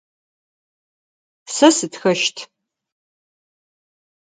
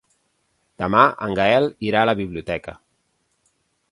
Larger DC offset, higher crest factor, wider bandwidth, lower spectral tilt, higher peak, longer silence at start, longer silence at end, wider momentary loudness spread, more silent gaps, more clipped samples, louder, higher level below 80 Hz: neither; about the same, 22 dB vs 22 dB; second, 9.6 kHz vs 11.5 kHz; second, -3 dB/octave vs -6.5 dB/octave; about the same, 0 dBFS vs 0 dBFS; first, 1.5 s vs 0.8 s; first, 1.9 s vs 1.2 s; about the same, 13 LU vs 13 LU; neither; neither; about the same, -17 LUFS vs -19 LUFS; second, -78 dBFS vs -50 dBFS